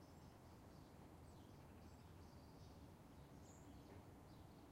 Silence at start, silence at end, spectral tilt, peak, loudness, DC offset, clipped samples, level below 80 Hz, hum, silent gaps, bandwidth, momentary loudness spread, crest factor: 0 s; 0 s; -6 dB/octave; -48 dBFS; -63 LUFS; under 0.1%; under 0.1%; -70 dBFS; none; none; 16 kHz; 1 LU; 14 dB